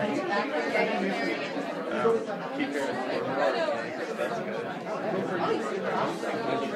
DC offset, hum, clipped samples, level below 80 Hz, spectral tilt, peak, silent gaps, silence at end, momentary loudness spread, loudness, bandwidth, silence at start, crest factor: under 0.1%; none; under 0.1%; -76 dBFS; -5.5 dB/octave; -12 dBFS; none; 0 s; 6 LU; -29 LUFS; 14 kHz; 0 s; 16 dB